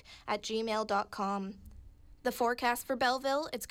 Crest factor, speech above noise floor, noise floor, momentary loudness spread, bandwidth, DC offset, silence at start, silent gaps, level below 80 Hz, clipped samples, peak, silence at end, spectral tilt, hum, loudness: 16 dB; 21 dB; -54 dBFS; 8 LU; 19.5 kHz; under 0.1%; 0.05 s; none; -60 dBFS; under 0.1%; -20 dBFS; 0 s; -3.5 dB/octave; none; -33 LUFS